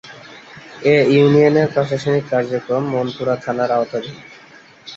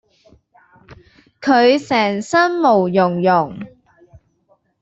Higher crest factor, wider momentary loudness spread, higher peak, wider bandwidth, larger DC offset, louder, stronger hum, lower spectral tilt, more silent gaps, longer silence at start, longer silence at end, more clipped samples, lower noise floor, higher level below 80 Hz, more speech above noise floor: about the same, 16 dB vs 16 dB; first, 25 LU vs 12 LU; about the same, -2 dBFS vs -2 dBFS; about the same, 7.8 kHz vs 8.2 kHz; neither; about the same, -17 LUFS vs -15 LUFS; neither; first, -7 dB/octave vs -5.5 dB/octave; neither; second, 0.05 s vs 0.9 s; second, 0 s vs 1.15 s; neither; second, -44 dBFS vs -60 dBFS; about the same, -58 dBFS vs -58 dBFS; second, 28 dB vs 46 dB